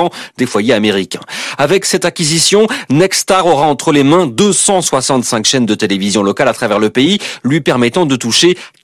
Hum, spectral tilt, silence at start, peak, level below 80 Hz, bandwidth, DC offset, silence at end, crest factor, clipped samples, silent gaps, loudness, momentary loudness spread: none; -3.5 dB/octave; 0 s; 0 dBFS; -50 dBFS; over 20 kHz; under 0.1%; 0.15 s; 10 dB; under 0.1%; none; -11 LUFS; 6 LU